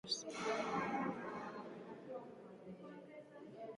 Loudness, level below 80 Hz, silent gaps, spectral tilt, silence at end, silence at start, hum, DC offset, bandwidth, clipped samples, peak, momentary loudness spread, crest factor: -44 LUFS; -80 dBFS; none; -3.5 dB/octave; 0 s; 0.05 s; none; under 0.1%; 11 kHz; under 0.1%; -28 dBFS; 16 LU; 18 dB